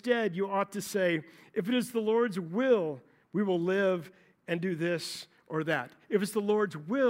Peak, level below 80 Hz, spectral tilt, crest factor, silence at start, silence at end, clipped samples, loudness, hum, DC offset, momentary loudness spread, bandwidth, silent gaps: -14 dBFS; -82 dBFS; -5.5 dB/octave; 16 dB; 0.05 s; 0 s; under 0.1%; -31 LUFS; none; under 0.1%; 9 LU; 16 kHz; none